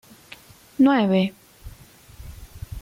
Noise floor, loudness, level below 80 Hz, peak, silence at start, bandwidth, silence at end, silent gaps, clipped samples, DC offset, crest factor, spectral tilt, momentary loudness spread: -48 dBFS; -20 LUFS; -46 dBFS; -8 dBFS; 0.8 s; 16 kHz; 0 s; none; under 0.1%; under 0.1%; 16 dB; -7 dB/octave; 26 LU